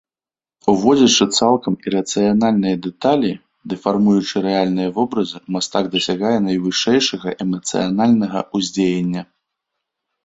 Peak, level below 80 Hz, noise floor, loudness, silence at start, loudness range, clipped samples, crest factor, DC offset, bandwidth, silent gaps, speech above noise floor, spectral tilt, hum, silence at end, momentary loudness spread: -2 dBFS; -56 dBFS; under -90 dBFS; -17 LUFS; 0.65 s; 3 LU; under 0.1%; 16 dB; under 0.1%; 8 kHz; none; over 73 dB; -4.5 dB/octave; none; 1 s; 9 LU